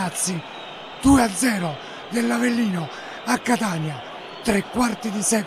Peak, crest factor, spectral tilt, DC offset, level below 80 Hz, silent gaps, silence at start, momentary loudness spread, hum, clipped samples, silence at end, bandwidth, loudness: -4 dBFS; 18 dB; -4 dB/octave; under 0.1%; -44 dBFS; none; 0 s; 16 LU; none; under 0.1%; 0 s; 14.5 kHz; -22 LUFS